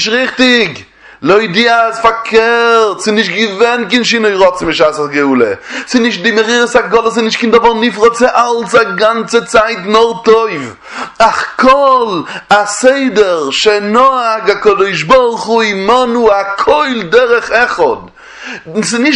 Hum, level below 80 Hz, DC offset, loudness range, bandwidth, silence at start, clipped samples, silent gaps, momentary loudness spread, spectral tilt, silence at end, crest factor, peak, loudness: none; -44 dBFS; under 0.1%; 1 LU; 11 kHz; 0 s; 0.4%; none; 6 LU; -3.5 dB/octave; 0 s; 10 dB; 0 dBFS; -10 LUFS